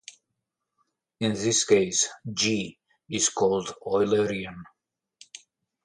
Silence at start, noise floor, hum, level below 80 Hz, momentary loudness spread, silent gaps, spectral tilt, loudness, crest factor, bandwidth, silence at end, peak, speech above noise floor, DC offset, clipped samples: 1.2 s; -83 dBFS; none; -62 dBFS; 19 LU; none; -3 dB/octave; -25 LUFS; 20 dB; 11.5 kHz; 1.2 s; -6 dBFS; 57 dB; under 0.1%; under 0.1%